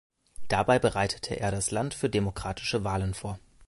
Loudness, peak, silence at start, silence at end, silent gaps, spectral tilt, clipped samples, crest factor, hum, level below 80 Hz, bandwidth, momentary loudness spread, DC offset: -29 LUFS; -10 dBFS; 0.35 s; 0.05 s; none; -4.5 dB/octave; under 0.1%; 20 dB; none; -46 dBFS; 11.5 kHz; 8 LU; under 0.1%